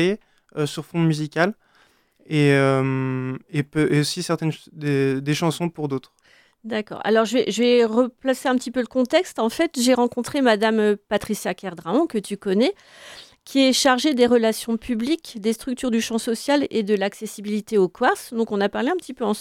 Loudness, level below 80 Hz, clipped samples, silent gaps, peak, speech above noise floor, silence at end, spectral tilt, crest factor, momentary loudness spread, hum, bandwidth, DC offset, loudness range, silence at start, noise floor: -22 LUFS; -58 dBFS; under 0.1%; none; -4 dBFS; 38 dB; 0 s; -5 dB/octave; 18 dB; 11 LU; none; 16.5 kHz; under 0.1%; 3 LU; 0 s; -59 dBFS